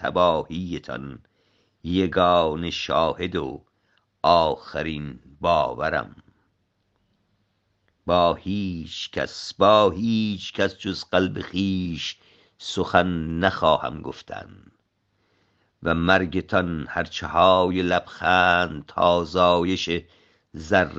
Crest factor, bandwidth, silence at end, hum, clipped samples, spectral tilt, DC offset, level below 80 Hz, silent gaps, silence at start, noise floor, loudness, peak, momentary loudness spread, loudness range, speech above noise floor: 22 dB; 8 kHz; 0 s; none; under 0.1%; -5.5 dB/octave; under 0.1%; -52 dBFS; none; 0 s; -70 dBFS; -22 LUFS; -2 dBFS; 16 LU; 7 LU; 48 dB